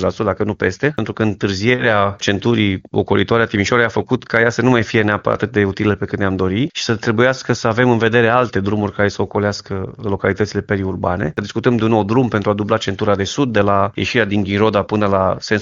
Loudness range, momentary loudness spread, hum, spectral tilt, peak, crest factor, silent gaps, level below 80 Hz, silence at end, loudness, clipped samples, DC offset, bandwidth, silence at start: 2 LU; 6 LU; none; -6 dB/octave; 0 dBFS; 16 dB; none; -46 dBFS; 0 s; -17 LUFS; under 0.1%; under 0.1%; 7.6 kHz; 0 s